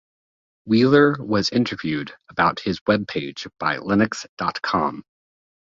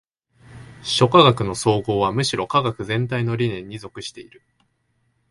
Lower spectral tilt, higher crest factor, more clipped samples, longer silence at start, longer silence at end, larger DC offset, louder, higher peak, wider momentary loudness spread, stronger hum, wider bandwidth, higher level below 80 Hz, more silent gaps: about the same, -6 dB/octave vs -5 dB/octave; about the same, 20 dB vs 22 dB; neither; first, 0.65 s vs 0.5 s; second, 0.75 s vs 1.1 s; neither; about the same, -21 LUFS vs -19 LUFS; about the same, -2 dBFS vs 0 dBFS; second, 12 LU vs 19 LU; neither; second, 7.8 kHz vs 11.5 kHz; about the same, -54 dBFS vs -50 dBFS; first, 2.81-2.86 s, 4.29-4.37 s vs none